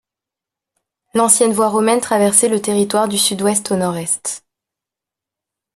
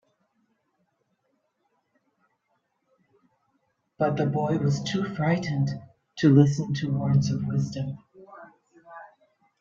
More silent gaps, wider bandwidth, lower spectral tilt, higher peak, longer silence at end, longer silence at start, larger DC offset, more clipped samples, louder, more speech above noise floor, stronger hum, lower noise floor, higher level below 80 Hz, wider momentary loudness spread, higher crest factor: neither; first, 14.5 kHz vs 7.4 kHz; second, -3 dB/octave vs -7.5 dB/octave; first, 0 dBFS vs -6 dBFS; first, 1.35 s vs 0.55 s; second, 1.15 s vs 4 s; neither; neither; first, -15 LUFS vs -25 LUFS; first, 71 dB vs 51 dB; neither; first, -86 dBFS vs -75 dBFS; about the same, -62 dBFS vs -62 dBFS; second, 8 LU vs 21 LU; about the same, 18 dB vs 22 dB